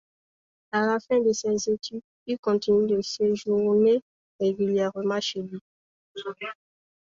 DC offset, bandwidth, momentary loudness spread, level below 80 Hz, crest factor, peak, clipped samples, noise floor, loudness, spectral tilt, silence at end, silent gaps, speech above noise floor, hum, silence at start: under 0.1%; 7.6 kHz; 15 LU; -66 dBFS; 14 dB; -12 dBFS; under 0.1%; under -90 dBFS; -25 LUFS; -5 dB/octave; 0.65 s; 2.04-2.26 s, 2.39-2.43 s, 4.02-4.39 s, 5.61-6.15 s; over 66 dB; none; 0.75 s